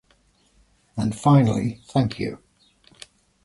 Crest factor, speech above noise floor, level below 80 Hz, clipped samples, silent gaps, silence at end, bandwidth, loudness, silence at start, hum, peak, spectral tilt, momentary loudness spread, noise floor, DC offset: 20 dB; 41 dB; -52 dBFS; under 0.1%; none; 1.1 s; 11.5 kHz; -22 LUFS; 0.95 s; none; -4 dBFS; -7.5 dB/octave; 16 LU; -62 dBFS; under 0.1%